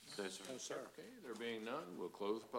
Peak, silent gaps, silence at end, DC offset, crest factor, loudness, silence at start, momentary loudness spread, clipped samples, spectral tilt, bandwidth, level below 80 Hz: -28 dBFS; none; 0 s; under 0.1%; 18 dB; -48 LUFS; 0 s; 8 LU; under 0.1%; -3 dB/octave; 16 kHz; -88 dBFS